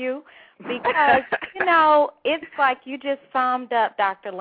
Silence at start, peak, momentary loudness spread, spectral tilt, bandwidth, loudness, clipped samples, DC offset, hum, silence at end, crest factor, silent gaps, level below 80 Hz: 0 s; -6 dBFS; 12 LU; -7 dB/octave; 5 kHz; -21 LUFS; under 0.1%; under 0.1%; none; 0 s; 16 dB; none; -64 dBFS